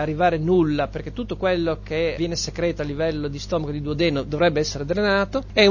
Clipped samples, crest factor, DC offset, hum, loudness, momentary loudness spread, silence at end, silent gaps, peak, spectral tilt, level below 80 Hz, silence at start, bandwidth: under 0.1%; 18 dB; under 0.1%; 50 Hz at -35 dBFS; -23 LUFS; 7 LU; 0 s; none; -4 dBFS; -5.5 dB/octave; -38 dBFS; 0 s; 7.2 kHz